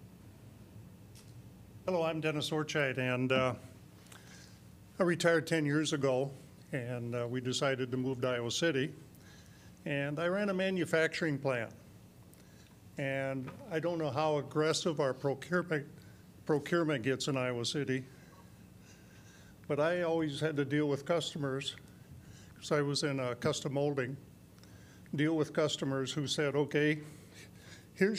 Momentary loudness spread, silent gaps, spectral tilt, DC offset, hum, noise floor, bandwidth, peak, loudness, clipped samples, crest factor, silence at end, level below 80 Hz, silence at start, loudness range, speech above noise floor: 22 LU; none; -5 dB/octave; under 0.1%; none; -57 dBFS; 15.5 kHz; -14 dBFS; -34 LUFS; under 0.1%; 20 dB; 0 s; -68 dBFS; 0 s; 3 LU; 24 dB